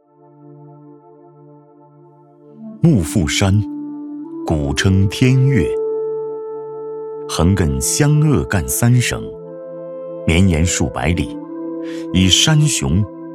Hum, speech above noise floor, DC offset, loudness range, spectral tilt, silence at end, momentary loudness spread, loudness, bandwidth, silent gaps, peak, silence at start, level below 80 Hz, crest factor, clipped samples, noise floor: none; 31 dB; under 0.1%; 4 LU; -5 dB/octave; 0 s; 16 LU; -16 LUFS; 16 kHz; none; 0 dBFS; 0.45 s; -32 dBFS; 18 dB; under 0.1%; -46 dBFS